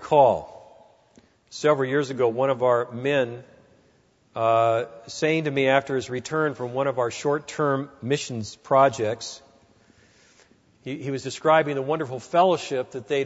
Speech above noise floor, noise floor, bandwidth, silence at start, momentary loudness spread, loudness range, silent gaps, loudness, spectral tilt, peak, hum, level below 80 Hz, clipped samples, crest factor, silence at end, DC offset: 38 dB; -61 dBFS; 8 kHz; 0 s; 13 LU; 3 LU; none; -24 LUFS; -5 dB/octave; -4 dBFS; none; -66 dBFS; under 0.1%; 20 dB; 0 s; under 0.1%